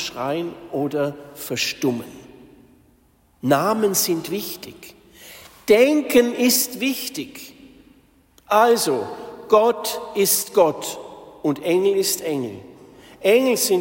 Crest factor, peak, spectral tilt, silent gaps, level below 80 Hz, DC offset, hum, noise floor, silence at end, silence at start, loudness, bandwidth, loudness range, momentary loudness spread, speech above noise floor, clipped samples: 18 dB; -4 dBFS; -3.5 dB/octave; none; -60 dBFS; under 0.1%; none; -58 dBFS; 0 s; 0 s; -20 LUFS; 16.5 kHz; 5 LU; 18 LU; 38 dB; under 0.1%